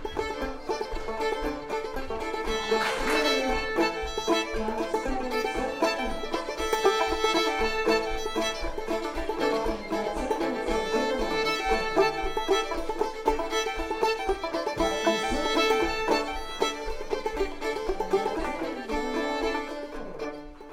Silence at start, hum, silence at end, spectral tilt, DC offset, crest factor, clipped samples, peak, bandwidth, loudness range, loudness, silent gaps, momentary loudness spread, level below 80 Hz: 0 s; none; 0 s; -3.5 dB/octave; under 0.1%; 20 dB; under 0.1%; -8 dBFS; 16.5 kHz; 3 LU; -28 LUFS; none; 8 LU; -40 dBFS